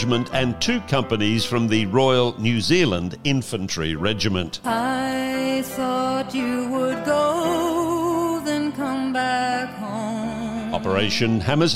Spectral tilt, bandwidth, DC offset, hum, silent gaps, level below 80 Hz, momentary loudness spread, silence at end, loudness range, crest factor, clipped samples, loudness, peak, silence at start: -5 dB/octave; 16 kHz; under 0.1%; none; none; -50 dBFS; 7 LU; 0 s; 3 LU; 16 dB; under 0.1%; -22 LUFS; -6 dBFS; 0 s